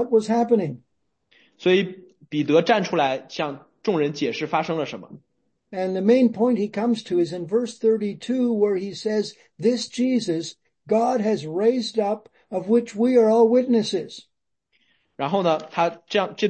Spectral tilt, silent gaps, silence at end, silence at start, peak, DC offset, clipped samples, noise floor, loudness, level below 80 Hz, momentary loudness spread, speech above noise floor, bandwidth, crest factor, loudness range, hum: -6 dB/octave; none; 0 s; 0 s; -4 dBFS; under 0.1%; under 0.1%; -71 dBFS; -22 LUFS; -70 dBFS; 12 LU; 50 dB; 8.8 kHz; 18 dB; 3 LU; none